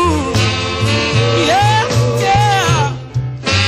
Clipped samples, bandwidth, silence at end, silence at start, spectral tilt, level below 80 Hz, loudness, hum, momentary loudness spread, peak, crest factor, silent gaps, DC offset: under 0.1%; 15.5 kHz; 0 s; 0 s; -4.5 dB/octave; -32 dBFS; -14 LUFS; none; 6 LU; -2 dBFS; 12 dB; none; under 0.1%